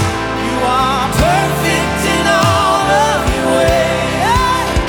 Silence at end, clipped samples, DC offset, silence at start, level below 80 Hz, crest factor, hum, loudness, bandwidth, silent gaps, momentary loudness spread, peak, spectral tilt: 0 s; under 0.1%; under 0.1%; 0 s; -26 dBFS; 12 dB; none; -13 LUFS; 19.5 kHz; none; 3 LU; 0 dBFS; -4.5 dB/octave